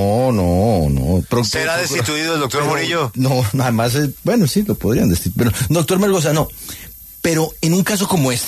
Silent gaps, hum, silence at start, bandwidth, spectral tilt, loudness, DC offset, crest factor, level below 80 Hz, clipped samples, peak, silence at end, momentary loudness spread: none; none; 0 s; 14 kHz; -5 dB/octave; -17 LUFS; under 0.1%; 12 dB; -34 dBFS; under 0.1%; -4 dBFS; 0 s; 3 LU